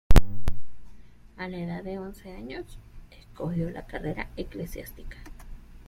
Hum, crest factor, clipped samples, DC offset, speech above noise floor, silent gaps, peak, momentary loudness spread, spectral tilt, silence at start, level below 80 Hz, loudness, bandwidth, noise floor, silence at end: none; 20 dB; under 0.1%; under 0.1%; 12 dB; none; -4 dBFS; 19 LU; -6.5 dB/octave; 0.1 s; -30 dBFS; -34 LUFS; 15.5 kHz; -47 dBFS; 0.3 s